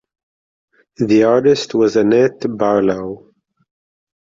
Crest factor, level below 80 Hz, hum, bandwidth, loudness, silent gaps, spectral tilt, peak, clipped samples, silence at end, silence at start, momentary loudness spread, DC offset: 14 dB; -54 dBFS; none; 7.6 kHz; -15 LUFS; none; -6 dB/octave; -2 dBFS; under 0.1%; 1.15 s; 1 s; 12 LU; under 0.1%